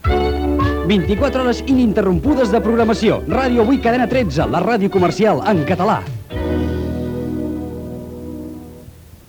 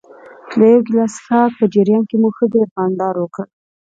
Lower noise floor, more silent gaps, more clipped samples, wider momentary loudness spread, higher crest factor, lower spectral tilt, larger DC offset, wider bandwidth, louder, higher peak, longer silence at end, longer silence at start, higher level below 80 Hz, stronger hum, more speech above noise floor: about the same, -39 dBFS vs -37 dBFS; second, none vs 2.71-2.76 s; neither; first, 14 LU vs 11 LU; about the same, 14 dB vs 14 dB; about the same, -7 dB/octave vs -7.5 dB/octave; neither; first, over 20 kHz vs 7.8 kHz; about the same, -17 LUFS vs -15 LUFS; about the same, -2 dBFS vs 0 dBFS; second, 0.25 s vs 0.45 s; second, 0.05 s vs 0.45 s; first, -30 dBFS vs -64 dBFS; neither; about the same, 24 dB vs 23 dB